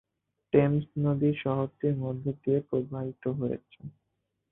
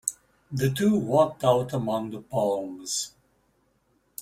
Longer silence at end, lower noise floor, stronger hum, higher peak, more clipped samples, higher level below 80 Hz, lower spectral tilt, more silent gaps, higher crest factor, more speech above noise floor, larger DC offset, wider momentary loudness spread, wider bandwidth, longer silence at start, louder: first, 0.6 s vs 0 s; first, -80 dBFS vs -68 dBFS; neither; about the same, -8 dBFS vs -6 dBFS; neither; about the same, -62 dBFS vs -60 dBFS; first, -12.5 dB/octave vs -5 dB/octave; neither; about the same, 22 dB vs 20 dB; first, 52 dB vs 43 dB; neither; about the same, 12 LU vs 10 LU; second, 3.8 kHz vs 16 kHz; first, 0.55 s vs 0.05 s; second, -29 LUFS vs -26 LUFS